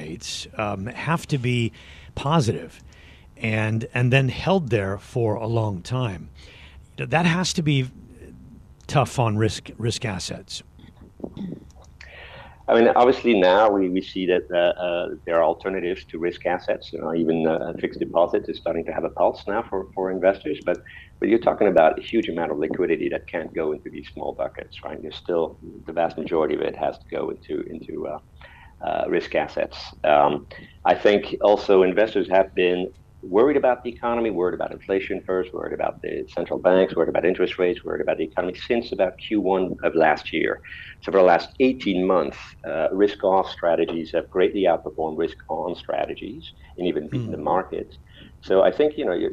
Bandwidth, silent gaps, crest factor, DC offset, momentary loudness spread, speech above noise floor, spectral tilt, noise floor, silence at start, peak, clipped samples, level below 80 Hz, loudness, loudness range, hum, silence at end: 13 kHz; none; 20 dB; under 0.1%; 15 LU; 25 dB; -6 dB/octave; -47 dBFS; 0 s; -2 dBFS; under 0.1%; -50 dBFS; -23 LUFS; 7 LU; none; 0 s